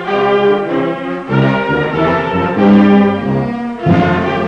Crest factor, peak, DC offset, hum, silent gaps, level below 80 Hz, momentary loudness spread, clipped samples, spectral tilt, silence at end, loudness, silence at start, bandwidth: 12 dB; 0 dBFS; under 0.1%; none; none; -40 dBFS; 8 LU; under 0.1%; -8.5 dB/octave; 0 s; -13 LUFS; 0 s; 6.6 kHz